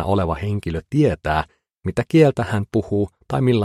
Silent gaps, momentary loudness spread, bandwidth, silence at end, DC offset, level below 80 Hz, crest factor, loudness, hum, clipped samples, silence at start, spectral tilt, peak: none; 10 LU; 12.5 kHz; 0 s; under 0.1%; -40 dBFS; 18 dB; -20 LUFS; none; under 0.1%; 0 s; -8 dB/octave; -2 dBFS